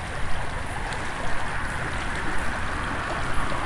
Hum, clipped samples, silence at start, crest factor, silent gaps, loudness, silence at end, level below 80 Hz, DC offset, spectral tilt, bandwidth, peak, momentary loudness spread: none; under 0.1%; 0 s; 14 dB; none; -29 LUFS; 0 s; -34 dBFS; under 0.1%; -4.5 dB/octave; 11.5 kHz; -10 dBFS; 3 LU